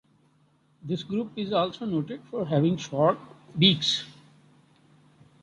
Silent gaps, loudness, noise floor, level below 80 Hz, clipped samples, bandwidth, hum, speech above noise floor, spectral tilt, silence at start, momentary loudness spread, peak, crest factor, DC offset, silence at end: none; -26 LUFS; -64 dBFS; -66 dBFS; under 0.1%; 10 kHz; none; 38 dB; -5.5 dB/octave; 0.85 s; 14 LU; -6 dBFS; 22 dB; under 0.1%; 1.3 s